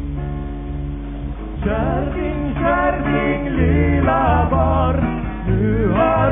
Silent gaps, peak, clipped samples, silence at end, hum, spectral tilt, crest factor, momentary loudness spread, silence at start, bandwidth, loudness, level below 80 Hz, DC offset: none; -4 dBFS; under 0.1%; 0 s; none; -12 dB/octave; 14 dB; 12 LU; 0 s; 3.7 kHz; -19 LUFS; -24 dBFS; 0.2%